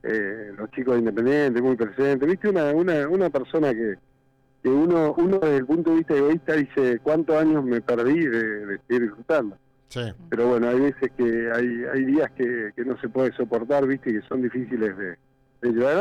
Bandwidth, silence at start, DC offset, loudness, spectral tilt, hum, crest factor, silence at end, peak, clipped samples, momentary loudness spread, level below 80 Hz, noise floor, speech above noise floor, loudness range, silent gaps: 9.4 kHz; 0.05 s; under 0.1%; -23 LUFS; -8 dB/octave; none; 8 dB; 0 s; -14 dBFS; under 0.1%; 9 LU; -60 dBFS; -62 dBFS; 39 dB; 3 LU; none